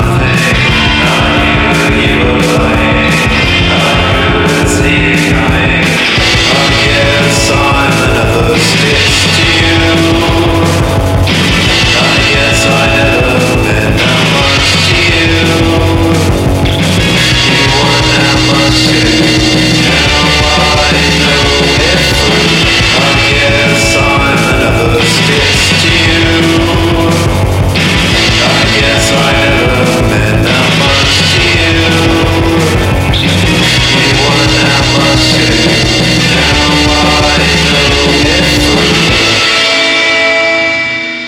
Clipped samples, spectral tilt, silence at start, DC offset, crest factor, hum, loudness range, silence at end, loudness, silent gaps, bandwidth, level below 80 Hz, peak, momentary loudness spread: under 0.1%; -4 dB/octave; 0 s; under 0.1%; 8 dB; none; 1 LU; 0 s; -7 LUFS; none; 16.5 kHz; -20 dBFS; 0 dBFS; 3 LU